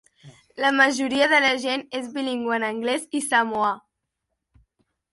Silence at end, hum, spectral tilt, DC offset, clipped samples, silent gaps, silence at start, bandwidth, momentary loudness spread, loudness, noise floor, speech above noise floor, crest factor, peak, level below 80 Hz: 1.35 s; none; -2 dB/octave; under 0.1%; under 0.1%; none; 0.25 s; 11.5 kHz; 10 LU; -22 LUFS; -80 dBFS; 58 dB; 20 dB; -4 dBFS; -68 dBFS